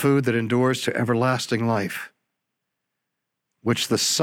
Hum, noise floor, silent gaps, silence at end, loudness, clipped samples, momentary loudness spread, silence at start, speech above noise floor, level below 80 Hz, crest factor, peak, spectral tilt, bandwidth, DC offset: none; -81 dBFS; none; 0 s; -23 LUFS; under 0.1%; 10 LU; 0 s; 59 dB; -66 dBFS; 16 dB; -8 dBFS; -4.5 dB/octave; 17 kHz; under 0.1%